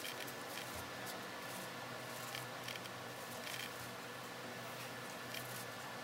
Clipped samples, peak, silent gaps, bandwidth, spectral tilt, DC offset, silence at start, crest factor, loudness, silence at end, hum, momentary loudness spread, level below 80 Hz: under 0.1%; -26 dBFS; none; 16 kHz; -2.5 dB/octave; under 0.1%; 0 s; 20 dB; -46 LUFS; 0 s; none; 3 LU; -78 dBFS